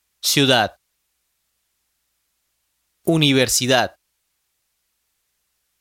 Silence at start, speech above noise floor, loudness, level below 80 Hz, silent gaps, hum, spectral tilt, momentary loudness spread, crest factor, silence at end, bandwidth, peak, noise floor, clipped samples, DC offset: 0.25 s; 55 dB; -17 LUFS; -58 dBFS; none; none; -3.5 dB/octave; 11 LU; 22 dB; 1.9 s; 16.5 kHz; 0 dBFS; -72 dBFS; under 0.1%; under 0.1%